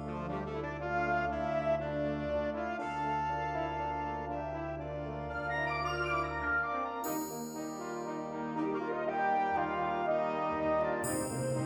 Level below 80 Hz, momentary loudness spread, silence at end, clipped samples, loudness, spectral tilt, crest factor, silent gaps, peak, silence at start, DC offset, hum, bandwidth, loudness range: -52 dBFS; 7 LU; 0 s; under 0.1%; -34 LUFS; -5.5 dB/octave; 14 dB; none; -20 dBFS; 0 s; under 0.1%; none; 18 kHz; 3 LU